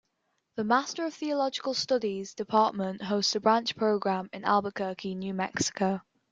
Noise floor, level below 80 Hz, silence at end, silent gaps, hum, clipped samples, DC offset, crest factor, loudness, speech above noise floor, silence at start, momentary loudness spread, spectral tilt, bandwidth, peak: -77 dBFS; -70 dBFS; 0.3 s; none; none; under 0.1%; under 0.1%; 20 dB; -29 LUFS; 49 dB; 0.55 s; 8 LU; -4 dB/octave; 9.4 kHz; -8 dBFS